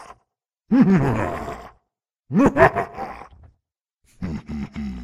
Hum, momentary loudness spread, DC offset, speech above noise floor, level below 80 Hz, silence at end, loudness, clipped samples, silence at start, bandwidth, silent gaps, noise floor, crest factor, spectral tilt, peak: none; 19 LU; under 0.1%; 61 dB; -42 dBFS; 0 s; -20 LUFS; under 0.1%; 0 s; 12 kHz; none; -78 dBFS; 22 dB; -8 dB/octave; 0 dBFS